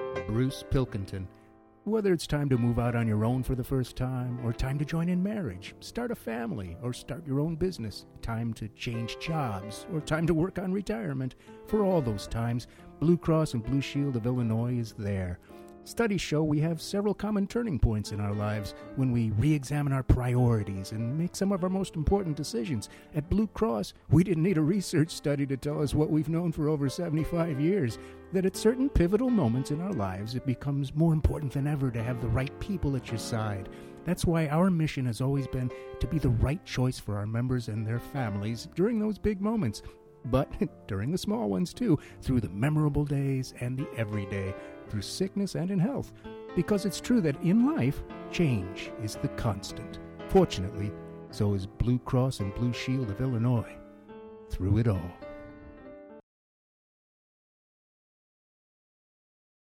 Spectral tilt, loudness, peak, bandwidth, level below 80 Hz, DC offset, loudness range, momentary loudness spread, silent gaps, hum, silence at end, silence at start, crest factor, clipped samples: -7 dB/octave; -30 LUFS; -8 dBFS; 16.5 kHz; -44 dBFS; under 0.1%; 4 LU; 12 LU; none; none; 3.6 s; 0 s; 20 dB; under 0.1%